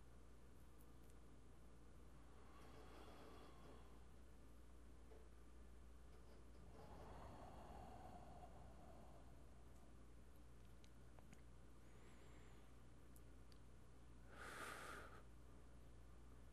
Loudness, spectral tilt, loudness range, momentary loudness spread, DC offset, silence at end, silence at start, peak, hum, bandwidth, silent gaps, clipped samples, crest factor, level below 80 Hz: -64 LUFS; -5 dB/octave; 6 LU; 7 LU; under 0.1%; 0 s; 0 s; -38 dBFS; none; 13 kHz; none; under 0.1%; 24 dB; -66 dBFS